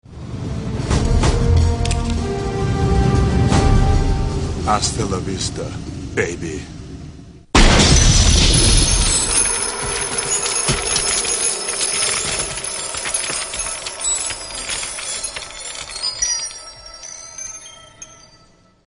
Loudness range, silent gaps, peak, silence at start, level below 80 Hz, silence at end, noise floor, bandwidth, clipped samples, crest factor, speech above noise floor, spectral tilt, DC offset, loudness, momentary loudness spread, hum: 10 LU; none; 0 dBFS; 0.1 s; -22 dBFS; 0.75 s; -51 dBFS; 11 kHz; under 0.1%; 18 dB; 30 dB; -3.5 dB/octave; under 0.1%; -17 LUFS; 18 LU; none